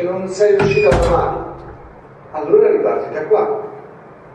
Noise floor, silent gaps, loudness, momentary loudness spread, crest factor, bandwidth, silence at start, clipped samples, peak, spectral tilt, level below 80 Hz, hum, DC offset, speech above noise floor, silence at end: -39 dBFS; none; -15 LUFS; 19 LU; 16 dB; 9.4 kHz; 0 s; under 0.1%; 0 dBFS; -6.5 dB/octave; -32 dBFS; none; under 0.1%; 24 dB; 0 s